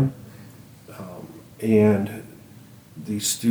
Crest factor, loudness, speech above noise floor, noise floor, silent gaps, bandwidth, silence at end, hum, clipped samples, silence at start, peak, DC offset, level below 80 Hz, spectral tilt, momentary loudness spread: 18 dB; -22 LUFS; 26 dB; -47 dBFS; none; over 20 kHz; 0 s; none; under 0.1%; 0 s; -6 dBFS; under 0.1%; -60 dBFS; -5.5 dB/octave; 26 LU